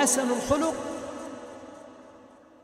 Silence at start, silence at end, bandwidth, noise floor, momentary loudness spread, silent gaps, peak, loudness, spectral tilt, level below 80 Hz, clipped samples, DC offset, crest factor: 0 s; 0.3 s; 16 kHz; -52 dBFS; 22 LU; none; -10 dBFS; -28 LUFS; -3 dB/octave; -54 dBFS; under 0.1%; under 0.1%; 18 dB